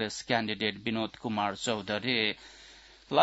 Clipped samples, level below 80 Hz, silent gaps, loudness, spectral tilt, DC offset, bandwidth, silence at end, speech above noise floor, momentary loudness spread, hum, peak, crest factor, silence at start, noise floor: under 0.1%; -66 dBFS; none; -31 LUFS; -4 dB/octave; under 0.1%; 8 kHz; 0 s; 22 dB; 16 LU; none; -10 dBFS; 22 dB; 0 s; -54 dBFS